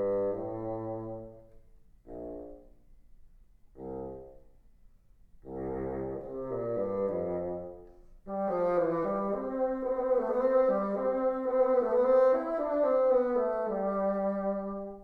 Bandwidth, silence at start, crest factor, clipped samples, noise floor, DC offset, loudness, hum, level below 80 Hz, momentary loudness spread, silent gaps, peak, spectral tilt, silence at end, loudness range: 4.4 kHz; 0 s; 16 dB; under 0.1%; -58 dBFS; under 0.1%; -30 LUFS; none; -56 dBFS; 17 LU; none; -16 dBFS; -10 dB/octave; 0 s; 20 LU